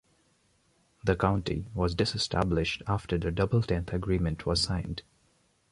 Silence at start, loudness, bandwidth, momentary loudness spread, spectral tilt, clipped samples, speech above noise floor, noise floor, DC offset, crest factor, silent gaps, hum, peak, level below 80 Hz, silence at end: 1.05 s; -29 LUFS; 11.5 kHz; 6 LU; -5.5 dB/octave; under 0.1%; 40 dB; -68 dBFS; under 0.1%; 20 dB; none; none; -10 dBFS; -42 dBFS; 0.7 s